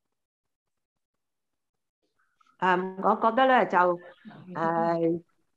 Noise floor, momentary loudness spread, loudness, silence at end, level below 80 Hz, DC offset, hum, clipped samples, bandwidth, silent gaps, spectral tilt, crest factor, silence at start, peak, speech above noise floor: -89 dBFS; 11 LU; -25 LUFS; 0.35 s; -78 dBFS; under 0.1%; none; under 0.1%; 7.8 kHz; none; -7 dB/octave; 20 dB; 2.6 s; -8 dBFS; 64 dB